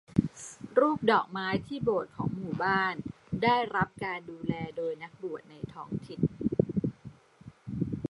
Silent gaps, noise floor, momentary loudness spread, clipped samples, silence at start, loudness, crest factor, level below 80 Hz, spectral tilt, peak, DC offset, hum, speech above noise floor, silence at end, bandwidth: none; -53 dBFS; 14 LU; under 0.1%; 0.1 s; -31 LUFS; 22 dB; -56 dBFS; -6.5 dB/octave; -8 dBFS; under 0.1%; none; 23 dB; 0.05 s; 11.5 kHz